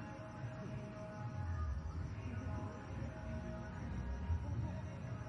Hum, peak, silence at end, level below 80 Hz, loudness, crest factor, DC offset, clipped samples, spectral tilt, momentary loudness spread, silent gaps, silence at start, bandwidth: none; -28 dBFS; 0 s; -50 dBFS; -45 LUFS; 16 dB; under 0.1%; under 0.1%; -8 dB/octave; 5 LU; none; 0 s; 7.8 kHz